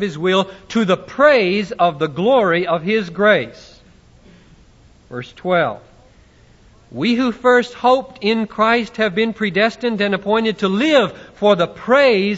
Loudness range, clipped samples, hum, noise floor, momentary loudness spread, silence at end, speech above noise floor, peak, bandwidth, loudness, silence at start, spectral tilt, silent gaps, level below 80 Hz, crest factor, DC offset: 7 LU; under 0.1%; none; -49 dBFS; 8 LU; 0 s; 32 dB; 0 dBFS; 8 kHz; -16 LUFS; 0 s; -5.5 dB/octave; none; -52 dBFS; 16 dB; under 0.1%